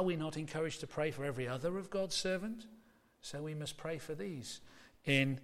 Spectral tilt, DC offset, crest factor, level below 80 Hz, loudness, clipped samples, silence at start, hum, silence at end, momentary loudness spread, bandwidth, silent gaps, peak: -5 dB/octave; under 0.1%; 22 dB; -66 dBFS; -39 LUFS; under 0.1%; 0 s; none; 0 s; 14 LU; 15.5 kHz; none; -18 dBFS